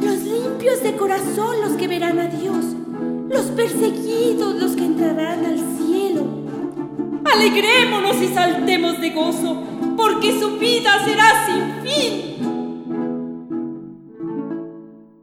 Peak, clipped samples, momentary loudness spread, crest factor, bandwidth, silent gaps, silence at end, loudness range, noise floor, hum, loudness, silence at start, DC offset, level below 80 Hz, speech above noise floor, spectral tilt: 0 dBFS; under 0.1%; 14 LU; 18 dB; 17 kHz; none; 0.25 s; 4 LU; -40 dBFS; none; -19 LUFS; 0 s; under 0.1%; -62 dBFS; 23 dB; -3.5 dB/octave